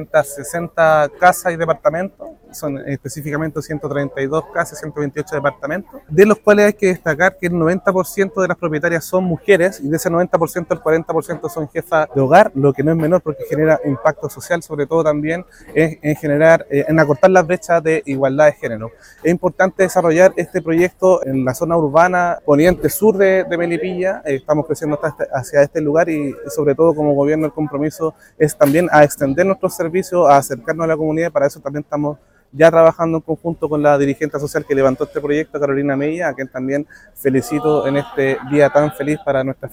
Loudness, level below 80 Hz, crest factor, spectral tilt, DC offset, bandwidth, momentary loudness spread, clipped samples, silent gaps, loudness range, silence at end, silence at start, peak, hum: -16 LUFS; -48 dBFS; 16 dB; -6.5 dB/octave; under 0.1%; 16.5 kHz; 11 LU; under 0.1%; none; 4 LU; 0.05 s; 0 s; 0 dBFS; none